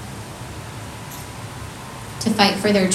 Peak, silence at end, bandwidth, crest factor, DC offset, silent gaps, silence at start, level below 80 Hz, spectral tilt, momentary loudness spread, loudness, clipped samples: 0 dBFS; 0 s; 14.5 kHz; 22 dB; under 0.1%; none; 0 s; -46 dBFS; -4 dB/octave; 17 LU; -21 LUFS; under 0.1%